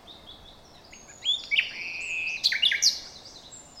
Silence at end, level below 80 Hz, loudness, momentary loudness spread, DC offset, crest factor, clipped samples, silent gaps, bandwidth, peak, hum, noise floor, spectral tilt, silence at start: 0 s; -62 dBFS; -25 LUFS; 24 LU; under 0.1%; 20 dB; under 0.1%; none; 17 kHz; -10 dBFS; none; -50 dBFS; 2 dB/octave; 0.05 s